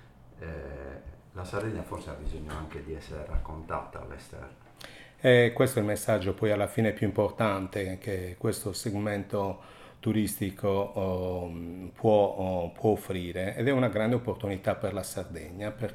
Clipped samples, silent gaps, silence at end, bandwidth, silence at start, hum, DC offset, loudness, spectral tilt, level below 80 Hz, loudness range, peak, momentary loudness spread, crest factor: under 0.1%; none; 0 s; 16 kHz; 0.05 s; none; under 0.1%; -30 LUFS; -6 dB/octave; -46 dBFS; 12 LU; -10 dBFS; 18 LU; 20 dB